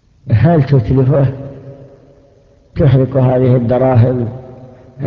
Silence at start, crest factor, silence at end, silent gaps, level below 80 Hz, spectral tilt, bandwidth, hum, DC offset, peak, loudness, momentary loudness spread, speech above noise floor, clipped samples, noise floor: 0.25 s; 12 dB; 0 s; none; -34 dBFS; -11.5 dB/octave; 5 kHz; none; under 0.1%; 0 dBFS; -12 LUFS; 18 LU; 37 dB; under 0.1%; -47 dBFS